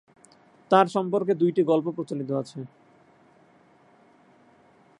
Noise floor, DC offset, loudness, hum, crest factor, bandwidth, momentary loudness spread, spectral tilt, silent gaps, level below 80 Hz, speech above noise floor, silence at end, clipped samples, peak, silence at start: -58 dBFS; under 0.1%; -24 LUFS; none; 24 dB; 10.5 kHz; 16 LU; -7 dB/octave; none; -80 dBFS; 34 dB; 2.35 s; under 0.1%; -4 dBFS; 0.7 s